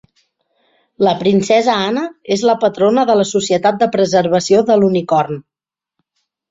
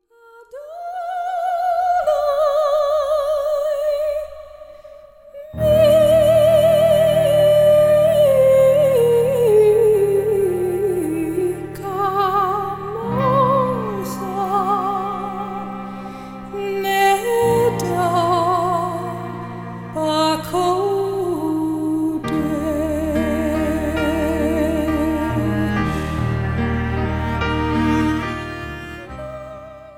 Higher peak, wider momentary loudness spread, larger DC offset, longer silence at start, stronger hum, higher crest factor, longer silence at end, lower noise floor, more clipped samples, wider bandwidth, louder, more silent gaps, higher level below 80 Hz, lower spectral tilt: about the same, -2 dBFS vs -4 dBFS; second, 6 LU vs 16 LU; neither; first, 1 s vs 0.35 s; neither; about the same, 14 dB vs 14 dB; first, 1.1 s vs 0.05 s; first, -73 dBFS vs -47 dBFS; neither; second, 7.8 kHz vs 17 kHz; first, -14 LUFS vs -18 LUFS; neither; second, -56 dBFS vs -36 dBFS; second, -5 dB/octave vs -6.5 dB/octave